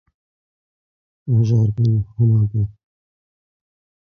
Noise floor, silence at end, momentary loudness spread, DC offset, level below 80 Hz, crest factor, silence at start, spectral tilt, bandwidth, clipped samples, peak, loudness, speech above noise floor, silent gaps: under -90 dBFS; 1.35 s; 9 LU; under 0.1%; -44 dBFS; 14 dB; 1.25 s; -10.5 dB/octave; 6.4 kHz; under 0.1%; -6 dBFS; -18 LUFS; over 74 dB; none